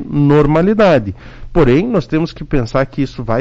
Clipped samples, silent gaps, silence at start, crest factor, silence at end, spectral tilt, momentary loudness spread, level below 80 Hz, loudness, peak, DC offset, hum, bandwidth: under 0.1%; none; 0 s; 10 dB; 0 s; -8.5 dB/octave; 9 LU; -28 dBFS; -14 LUFS; -4 dBFS; under 0.1%; none; 7.6 kHz